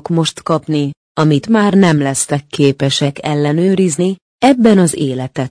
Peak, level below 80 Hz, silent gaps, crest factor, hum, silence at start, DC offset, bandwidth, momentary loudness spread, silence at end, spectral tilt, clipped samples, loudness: 0 dBFS; -52 dBFS; 0.97-1.15 s, 4.22-4.39 s; 12 dB; none; 0.05 s; under 0.1%; 10.5 kHz; 8 LU; 0 s; -5.5 dB/octave; under 0.1%; -13 LUFS